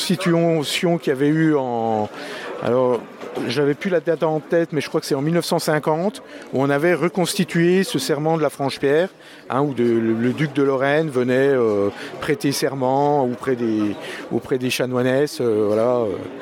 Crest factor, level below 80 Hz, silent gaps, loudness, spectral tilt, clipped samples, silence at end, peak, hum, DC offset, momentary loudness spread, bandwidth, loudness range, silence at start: 16 dB; -64 dBFS; none; -20 LUFS; -5.5 dB/octave; under 0.1%; 0 s; -4 dBFS; none; under 0.1%; 8 LU; 17 kHz; 2 LU; 0 s